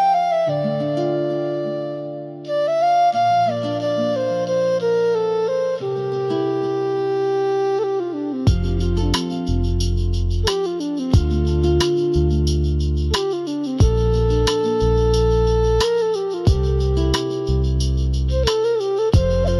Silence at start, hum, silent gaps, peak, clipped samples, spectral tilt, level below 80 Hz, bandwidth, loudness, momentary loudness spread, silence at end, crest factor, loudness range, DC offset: 0 s; none; none; -6 dBFS; under 0.1%; -6.5 dB/octave; -26 dBFS; 12.5 kHz; -20 LUFS; 6 LU; 0 s; 14 dB; 2 LU; under 0.1%